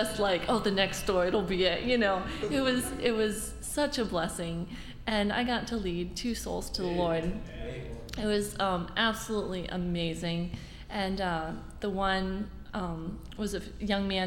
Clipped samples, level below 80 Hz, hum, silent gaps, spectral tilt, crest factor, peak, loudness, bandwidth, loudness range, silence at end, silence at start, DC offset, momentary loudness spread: under 0.1%; -44 dBFS; none; none; -4.5 dB/octave; 18 dB; -12 dBFS; -31 LUFS; 17 kHz; 5 LU; 0 s; 0 s; under 0.1%; 11 LU